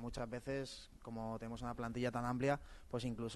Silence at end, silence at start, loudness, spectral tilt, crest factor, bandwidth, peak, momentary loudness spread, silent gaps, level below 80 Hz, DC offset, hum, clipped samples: 0 s; 0 s; -43 LUFS; -6 dB/octave; 18 dB; 12 kHz; -24 dBFS; 9 LU; none; -58 dBFS; under 0.1%; none; under 0.1%